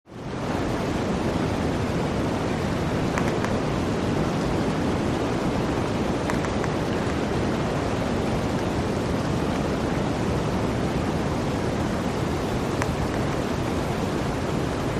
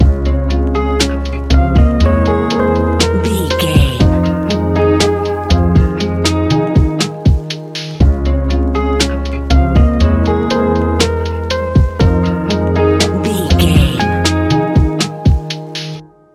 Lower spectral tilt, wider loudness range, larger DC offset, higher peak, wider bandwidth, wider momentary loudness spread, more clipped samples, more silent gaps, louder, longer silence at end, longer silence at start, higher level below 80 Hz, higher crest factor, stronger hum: about the same, -6.5 dB/octave vs -6 dB/octave; about the same, 1 LU vs 1 LU; neither; second, -6 dBFS vs 0 dBFS; about the same, 14.5 kHz vs 14 kHz; second, 2 LU vs 6 LU; neither; neither; second, -25 LUFS vs -13 LUFS; second, 0 s vs 0.3 s; about the same, 0.1 s vs 0 s; second, -38 dBFS vs -16 dBFS; first, 20 dB vs 12 dB; neither